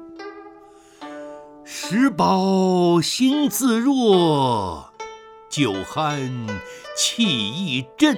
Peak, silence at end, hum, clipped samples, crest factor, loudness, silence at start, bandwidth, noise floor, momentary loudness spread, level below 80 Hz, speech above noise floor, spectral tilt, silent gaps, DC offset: -2 dBFS; 0 s; none; under 0.1%; 20 dB; -20 LUFS; 0 s; 19 kHz; -47 dBFS; 20 LU; -56 dBFS; 28 dB; -4.5 dB/octave; none; under 0.1%